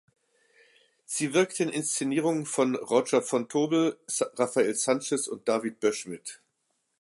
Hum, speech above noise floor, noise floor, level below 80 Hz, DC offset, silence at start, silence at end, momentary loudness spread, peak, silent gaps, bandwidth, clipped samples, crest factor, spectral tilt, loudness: none; 49 dB; -77 dBFS; -80 dBFS; under 0.1%; 1.1 s; 0.65 s; 6 LU; -10 dBFS; none; 11.5 kHz; under 0.1%; 18 dB; -4 dB/octave; -27 LUFS